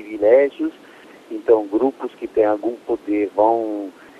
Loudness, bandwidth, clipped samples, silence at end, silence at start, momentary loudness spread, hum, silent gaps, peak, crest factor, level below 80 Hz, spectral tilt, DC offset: -19 LUFS; 7.8 kHz; under 0.1%; 0.3 s; 0 s; 12 LU; none; none; -2 dBFS; 18 dB; -60 dBFS; -7 dB/octave; under 0.1%